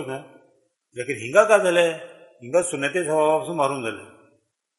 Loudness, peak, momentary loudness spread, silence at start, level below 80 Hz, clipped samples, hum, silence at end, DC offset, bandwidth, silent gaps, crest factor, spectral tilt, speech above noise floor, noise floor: -21 LUFS; -2 dBFS; 18 LU; 0 s; -70 dBFS; under 0.1%; none; 0.75 s; under 0.1%; 11.5 kHz; none; 22 dB; -4 dB/octave; 44 dB; -66 dBFS